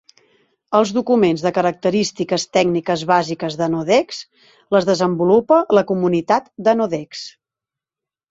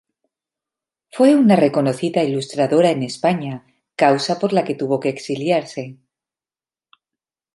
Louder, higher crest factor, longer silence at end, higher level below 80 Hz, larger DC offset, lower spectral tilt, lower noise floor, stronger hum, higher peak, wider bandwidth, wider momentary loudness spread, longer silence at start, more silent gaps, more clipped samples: about the same, -17 LUFS vs -18 LUFS; about the same, 16 dB vs 18 dB; second, 1 s vs 1.6 s; first, -60 dBFS vs -68 dBFS; neither; about the same, -5.5 dB/octave vs -6 dB/octave; about the same, -88 dBFS vs under -90 dBFS; neither; about the same, -2 dBFS vs -2 dBFS; second, 8 kHz vs 11.5 kHz; second, 9 LU vs 17 LU; second, 0.7 s vs 1.15 s; neither; neither